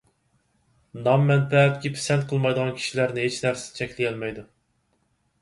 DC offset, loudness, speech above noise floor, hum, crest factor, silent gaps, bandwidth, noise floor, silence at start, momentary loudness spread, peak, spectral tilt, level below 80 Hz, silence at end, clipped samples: under 0.1%; -23 LUFS; 46 dB; none; 18 dB; none; 11.5 kHz; -69 dBFS; 0.95 s; 13 LU; -6 dBFS; -5.5 dB/octave; -60 dBFS; 0.95 s; under 0.1%